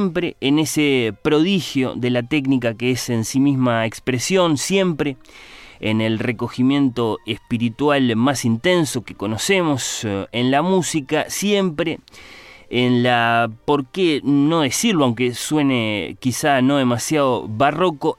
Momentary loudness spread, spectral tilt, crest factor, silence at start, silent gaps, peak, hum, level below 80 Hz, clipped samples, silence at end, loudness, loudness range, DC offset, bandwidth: 6 LU; -5 dB/octave; 14 dB; 0 s; none; -4 dBFS; none; -52 dBFS; under 0.1%; 0.05 s; -19 LUFS; 2 LU; under 0.1%; 15.5 kHz